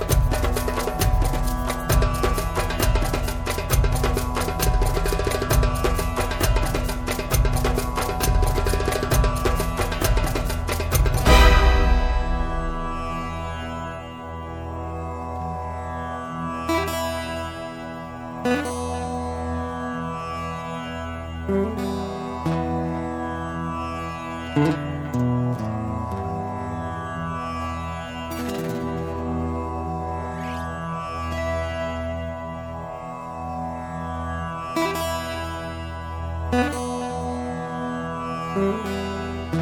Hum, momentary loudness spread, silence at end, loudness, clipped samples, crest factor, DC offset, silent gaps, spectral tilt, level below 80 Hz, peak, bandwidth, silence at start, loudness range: none; 9 LU; 0 s; -25 LUFS; under 0.1%; 22 dB; under 0.1%; none; -5.5 dB/octave; -28 dBFS; -2 dBFS; 17.5 kHz; 0 s; 8 LU